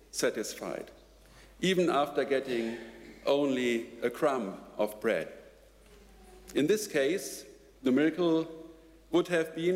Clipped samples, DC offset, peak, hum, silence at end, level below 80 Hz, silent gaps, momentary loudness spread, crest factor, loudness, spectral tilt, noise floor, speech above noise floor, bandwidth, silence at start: under 0.1%; under 0.1%; -16 dBFS; none; 0 s; -62 dBFS; none; 14 LU; 16 dB; -31 LUFS; -4.5 dB/octave; -57 dBFS; 27 dB; 16 kHz; 0.15 s